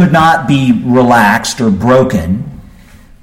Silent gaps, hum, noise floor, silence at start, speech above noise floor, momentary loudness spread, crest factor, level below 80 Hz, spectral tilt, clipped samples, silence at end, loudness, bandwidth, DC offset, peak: none; none; -37 dBFS; 0 s; 28 dB; 9 LU; 10 dB; -36 dBFS; -6 dB/octave; under 0.1%; 0.55 s; -10 LUFS; 16 kHz; under 0.1%; 0 dBFS